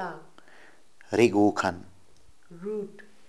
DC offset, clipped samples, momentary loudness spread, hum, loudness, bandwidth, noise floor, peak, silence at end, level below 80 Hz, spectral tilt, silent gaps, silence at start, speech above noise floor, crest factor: 0.3%; under 0.1%; 22 LU; none; -26 LUFS; 12 kHz; -60 dBFS; -6 dBFS; 0.3 s; -70 dBFS; -6 dB/octave; none; 0 s; 35 dB; 22 dB